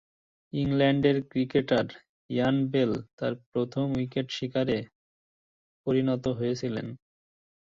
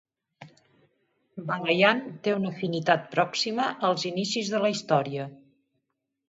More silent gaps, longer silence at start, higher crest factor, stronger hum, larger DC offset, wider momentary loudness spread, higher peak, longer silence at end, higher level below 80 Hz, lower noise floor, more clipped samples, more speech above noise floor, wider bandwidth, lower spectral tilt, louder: first, 2.09-2.29 s, 3.13-3.18 s, 3.46-3.52 s, 4.95-5.84 s vs none; first, 0.55 s vs 0.4 s; second, 18 dB vs 24 dB; neither; neither; second, 9 LU vs 12 LU; second, -10 dBFS vs -4 dBFS; second, 0.8 s vs 0.95 s; first, -60 dBFS vs -74 dBFS; first, under -90 dBFS vs -80 dBFS; neither; first, over 63 dB vs 54 dB; about the same, 7.4 kHz vs 8 kHz; first, -7.5 dB/octave vs -4.5 dB/octave; about the same, -28 LUFS vs -26 LUFS